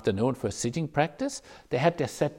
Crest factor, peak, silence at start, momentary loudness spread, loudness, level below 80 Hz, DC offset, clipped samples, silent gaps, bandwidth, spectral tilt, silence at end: 18 dB; -10 dBFS; 0 s; 8 LU; -29 LUFS; -58 dBFS; under 0.1%; under 0.1%; none; 16 kHz; -5.5 dB/octave; 0 s